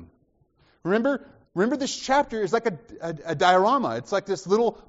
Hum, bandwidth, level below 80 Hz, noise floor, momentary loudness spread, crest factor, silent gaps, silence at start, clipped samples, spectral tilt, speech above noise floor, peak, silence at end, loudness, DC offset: none; 8 kHz; -60 dBFS; -65 dBFS; 14 LU; 20 dB; none; 0 s; under 0.1%; -3.5 dB/octave; 41 dB; -6 dBFS; 0.05 s; -24 LUFS; under 0.1%